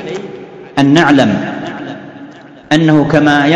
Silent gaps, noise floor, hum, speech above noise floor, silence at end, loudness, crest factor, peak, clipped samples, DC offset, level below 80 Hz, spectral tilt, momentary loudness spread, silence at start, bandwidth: none; -34 dBFS; none; 25 dB; 0 s; -11 LUFS; 12 dB; 0 dBFS; 0.7%; under 0.1%; -46 dBFS; -6 dB/octave; 20 LU; 0 s; 10 kHz